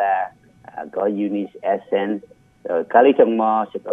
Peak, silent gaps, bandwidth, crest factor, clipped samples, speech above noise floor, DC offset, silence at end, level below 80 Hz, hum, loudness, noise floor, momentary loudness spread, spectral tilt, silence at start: 0 dBFS; none; 3.7 kHz; 20 dB; under 0.1%; 27 dB; under 0.1%; 0 s; -66 dBFS; none; -19 LUFS; -45 dBFS; 16 LU; -8 dB/octave; 0 s